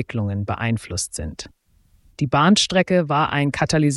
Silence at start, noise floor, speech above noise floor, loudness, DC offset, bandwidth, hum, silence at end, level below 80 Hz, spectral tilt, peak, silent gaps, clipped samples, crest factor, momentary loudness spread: 0 s; -57 dBFS; 37 dB; -20 LUFS; under 0.1%; 12 kHz; none; 0 s; -44 dBFS; -4.5 dB/octave; -4 dBFS; none; under 0.1%; 16 dB; 15 LU